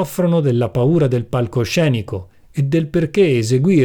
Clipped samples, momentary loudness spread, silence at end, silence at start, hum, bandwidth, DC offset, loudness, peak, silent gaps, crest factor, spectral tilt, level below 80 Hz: under 0.1%; 8 LU; 0 s; 0 s; none; 19 kHz; under 0.1%; -17 LUFS; -4 dBFS; none; 12 dB; -7 dB/octave; -46 dBFS